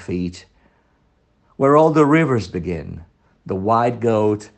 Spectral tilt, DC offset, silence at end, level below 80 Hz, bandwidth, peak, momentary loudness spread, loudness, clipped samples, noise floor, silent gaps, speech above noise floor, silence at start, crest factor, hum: -7.5 dB/octave; under 0.1%; 0.1 s; -52 dBFS; 8.8 kHz; 0 dBFS; 16 LU; -18 LUFS; under 0.1%; -61 dBFS; none; 43 dB; 0 s; 18 dB; none